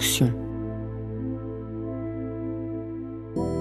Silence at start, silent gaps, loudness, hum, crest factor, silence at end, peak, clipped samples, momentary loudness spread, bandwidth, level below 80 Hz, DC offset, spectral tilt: 0 s; none; -30 LUFS; none; 20 dB; 0 s; -10 dBFS; under 0.1%; 10 LU; 16 kHz; -44 dBFS; under 0.1%; -4.5 dB/octave